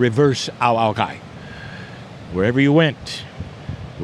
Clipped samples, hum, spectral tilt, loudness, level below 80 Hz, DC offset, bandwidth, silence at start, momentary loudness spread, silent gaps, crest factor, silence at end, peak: under 0.1%; none; -6 dB/octave; -19 LUFS; -46 dBFS; under 0.1%; 11.5 kHz; 0 s; 20 LU; none; 20 dB; 0 s; 0 dBFS